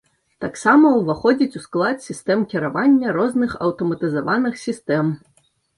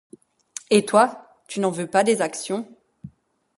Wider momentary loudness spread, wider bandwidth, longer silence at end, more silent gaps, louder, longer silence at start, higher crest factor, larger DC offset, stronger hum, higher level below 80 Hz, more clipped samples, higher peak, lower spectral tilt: second, 10 LU vs 19 LU; about the same, 11.5 kHz vs 11.5 kHz; about the same, 0.6 s vs 0.5 s; neither; about the same, -19 LUFS vs -21 LUFS; second, 0.4 s vs 0.7 s; second, 16 dB vs 22 dB; neither; neither; first, -56 dBFS vs -68 dBFS; neither; about the same, -2 dBFS vs -2 dBFS; first, -6.5 dB/octave vs -4 dB/octave